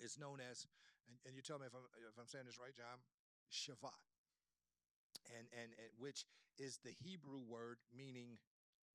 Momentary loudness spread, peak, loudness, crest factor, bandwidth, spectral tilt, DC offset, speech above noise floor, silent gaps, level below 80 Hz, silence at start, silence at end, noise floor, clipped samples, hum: 10 LU; -36 dBFS; -56 LUFS; 22 dB; 13 kHz; -3 dB/octave; under 0.1%; over 33 dB; 3.14-3.46 s, 4.18-4.24 s, 4.91-5.10 s; under -90 dBFS; 0 s; 0.55 s; under -90 dBFS; under 0.1%; none